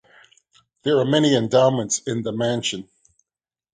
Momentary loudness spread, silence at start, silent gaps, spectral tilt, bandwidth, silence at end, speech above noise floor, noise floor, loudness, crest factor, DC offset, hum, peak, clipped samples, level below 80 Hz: 9 LU; 0.85 s; none; -4.5 dB/octave; 9.6 kHz; 0.9 s; over 70 dB; under -90 dBFS; -20 LUFS; 18 dB; under 0.1%; none; -4 dBFS; under 0.1%; -62 dBFS